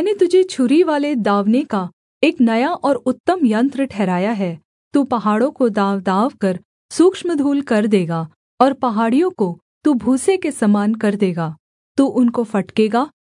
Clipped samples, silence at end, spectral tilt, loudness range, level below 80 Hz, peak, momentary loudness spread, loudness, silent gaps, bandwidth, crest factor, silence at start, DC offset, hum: under 0.1%; 0.25 s; -6.5 dB/octave; 1 LU; -64 dBFS; 0 dBFS; 8 LU; -17 LUFS; 1.93-2.21 s, 3.20-3.24 s, 4.65-4.91 s, 6.65-6.89 s, 8.36-8.58 s, 9.62-9.81 s, 11.60-11.95 s; 11 kHz; 16 dB; 0 s; under 0.1%; none